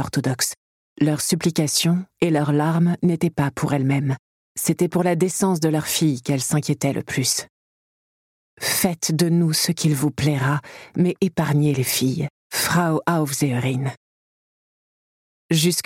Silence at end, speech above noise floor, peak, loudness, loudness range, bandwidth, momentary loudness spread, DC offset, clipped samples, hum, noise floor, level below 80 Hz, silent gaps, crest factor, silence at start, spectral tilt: 0.05 s; over 70 dB; -6 dBFS; -21 LUFS; 3 LU; 17 kHz; 6 LU; under 0.1%; under 0.1%; none; under -90 dBFS; -56 dBFS; 0.57-0.96 s, 4.19-4.55 s, 7.50-8.57 s, 12.30-12.50 s, 13.97-15.49 s; 16 dB; 0 s; -4.5 dB/octave